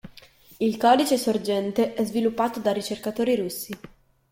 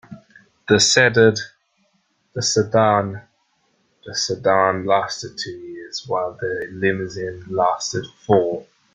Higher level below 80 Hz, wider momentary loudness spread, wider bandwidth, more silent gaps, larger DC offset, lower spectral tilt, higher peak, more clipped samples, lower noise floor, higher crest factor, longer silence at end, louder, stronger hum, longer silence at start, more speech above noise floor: about the same, -62 dBFS vs -58 dBFS; second, 11 LU vs 16 LU; first, 16.5 kHz vs 9.6 kHz; neither; neither; about the same, -4.5 dB/octave vs -3.5 dB/octave; second, -6 dBFS vs -2 dBFS; neither; second, -51 dBFS vs -66 dBFS; about the same, 20 dB vs 20 dB; first, 0.45 s vs 0.3 s; second, -24 LUFS vs -19 LUFS; neither; about the same, 0.05 s vs 0.1 s; second, 27 dB vs 46 dB